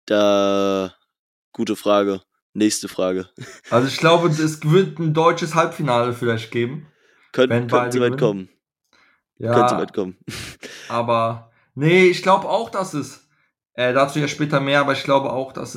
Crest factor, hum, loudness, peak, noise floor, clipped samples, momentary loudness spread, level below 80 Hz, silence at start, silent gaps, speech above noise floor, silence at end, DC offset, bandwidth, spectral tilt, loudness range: 18 dB; none; -19 LUFS; -2 dBFS; -66 dBFS; under 0.1%; 15 LU; -66 dBFS; 0.05 s; 1.19-1.52 s, 2.42-2.53 s; 48 dB; 0 s; under 0.1%; 16 kHz; -5.5 dB/octave; 4 LU